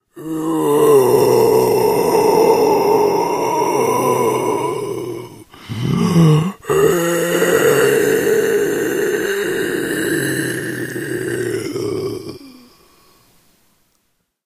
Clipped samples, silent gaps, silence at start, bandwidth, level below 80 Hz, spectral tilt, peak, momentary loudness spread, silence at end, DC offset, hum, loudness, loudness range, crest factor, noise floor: under 0.1%; none; 0.15 s; 15.5 kHz; -52 dBFS; -5.5 dB/octave; 0 dBFS; 11 LU; 1.95 s; under 0.1%; none; -16 LUFS; 10 LU; 16 dB; -66 dBFS